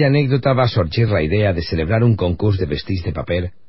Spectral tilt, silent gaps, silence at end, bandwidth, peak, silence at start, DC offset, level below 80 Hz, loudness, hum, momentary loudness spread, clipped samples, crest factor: -11.5 dB/octave; none; 0.2 s; 5.8 kHz; -4 dBFS; 0 s; 1%; -32 dBFS; -18 LUFS; none; 7 LU; under 0.1%; 14 dB